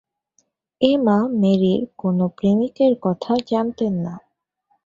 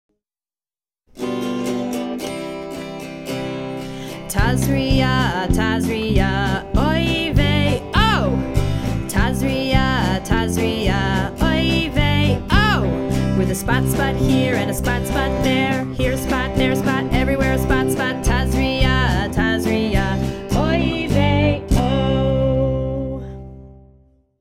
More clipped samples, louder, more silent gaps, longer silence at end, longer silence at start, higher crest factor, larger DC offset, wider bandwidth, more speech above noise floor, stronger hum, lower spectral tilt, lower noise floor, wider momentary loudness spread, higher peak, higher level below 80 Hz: neither; about the same, -19 LUFS vs -19 LUFS; neither; about the same, 0.7 s vs 0.65 s; second, 0.8 s vs 1.15 s; about the same, 18 dB vs 18 dB; neither; second, 7.4 kHz vs 16 kHz; second, 49 dB vs over 72 dB; neither; first, -8.5 dB/octave vs -6 dB/octave; second, -68 dBFS vs under -90 dBFS; second, 6 LU vs 10 LU; about the same, -2 dBFS vs 0 dBFS; second, -58 dBFS vs -26 dBFS